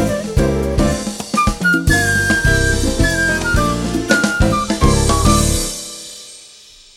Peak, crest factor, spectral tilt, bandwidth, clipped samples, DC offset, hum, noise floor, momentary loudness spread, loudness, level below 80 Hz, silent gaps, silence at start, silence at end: -2 dBFS; 14 dB; -4.5 dB/octave; 16.5 kHz; under 0.1%; under 0.1%; none; -42 dBFS; 9 LU; -15 LUFS; -22 dBFS; none; 0 s; 0.55 s